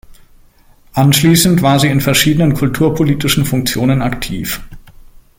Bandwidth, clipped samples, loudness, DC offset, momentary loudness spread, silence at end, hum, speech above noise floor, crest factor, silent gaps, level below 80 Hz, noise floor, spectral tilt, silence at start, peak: 17 kHz; under 0.1%; -12 LUFS; under 0.1%; 11 LU; 0.6 s; none; 34 dB; 14 dB; none; -34 dBFS; -45 dBFS; -5 dB/octave; 0.95 s; 0 dBFS